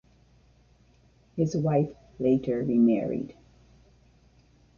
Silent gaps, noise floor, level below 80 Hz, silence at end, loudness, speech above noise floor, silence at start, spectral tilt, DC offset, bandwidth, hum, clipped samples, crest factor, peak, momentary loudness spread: none; -61 dBFS; -60 dBFS; 1.45 s; -26 LUFS; 36 dB; 1.35 s; -9 dB/octave; under 0.1%; 7 kHz; none; under 0.1%; 18 dB; -10 dBFS; 12 LU